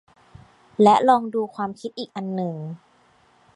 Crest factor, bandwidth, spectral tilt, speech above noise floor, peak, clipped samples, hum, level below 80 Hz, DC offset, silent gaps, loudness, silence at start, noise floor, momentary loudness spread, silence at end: 22 dB; 11.5 kHz; -6.5 dB/octave; 37 dB; -2 dBFS; under 0.1%; none; -66 dBFS; under 0.1%; none; -21 LUFS; 0.8 s; -58 dBFS; 20 LU; 0.8 s